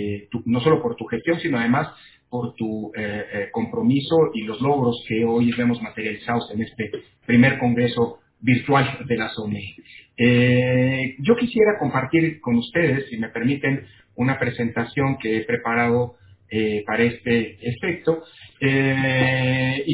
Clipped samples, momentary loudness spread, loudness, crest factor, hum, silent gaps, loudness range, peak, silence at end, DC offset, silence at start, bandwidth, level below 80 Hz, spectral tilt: under 0.1%; 10 LU; -21 LUFS; 18 dB; none; none; 3 LU; -4 dBFS; 0 s; under 0.1%; 0 s; 4 kHz; -52 dBFS; -10.5 dB/octave